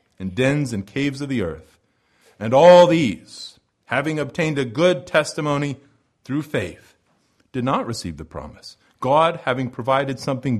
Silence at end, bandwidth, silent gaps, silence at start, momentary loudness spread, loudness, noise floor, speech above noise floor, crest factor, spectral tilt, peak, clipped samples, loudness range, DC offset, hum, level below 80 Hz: 0 s; 12.5 kHz; none; 0.2 s; 19 LU; -20 LUFS; -63 dBFS; 44 dB; 20 dB; -6 dB/octave; -2 dBFS; under 0.1%; 9 LU; under 0.1%; none; -52 dBFS